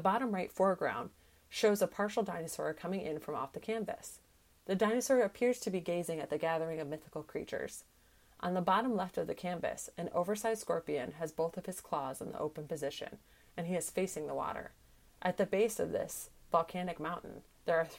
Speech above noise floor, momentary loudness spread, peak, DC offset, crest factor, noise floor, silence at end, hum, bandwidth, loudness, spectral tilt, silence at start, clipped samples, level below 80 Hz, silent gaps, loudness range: 28 dB; 12 LU; -16 dBFS; under 0.1%; 20 dB; -64 dBFS; 0 s; none; 16.5 kHz; -36 LUFS; -5 dB/octave; 0 s; under 0.1%; -68 dBFS; none; 4 LU